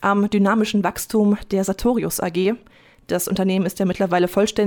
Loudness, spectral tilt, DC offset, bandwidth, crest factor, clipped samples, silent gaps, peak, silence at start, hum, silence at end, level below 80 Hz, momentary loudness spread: -20 LUFS; -5.5 dB/octave; under 0.1%; 19.5 kHz; 14 dB; under 0.1%; none; -6 dBFS; 0 s; none; 0 s; -46 dBFS; 5 LU